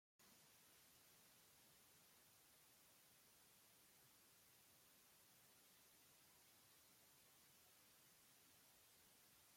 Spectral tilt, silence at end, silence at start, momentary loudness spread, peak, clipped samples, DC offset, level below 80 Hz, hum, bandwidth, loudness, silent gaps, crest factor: -1.5 dB/octave; 0 s; 0.2 s; 0 LU; -60 dBFS; under 0.1%; under 0.1%; under -90 dBFS; none; 16.5 kHz; -70 LUFS; none; 14 dB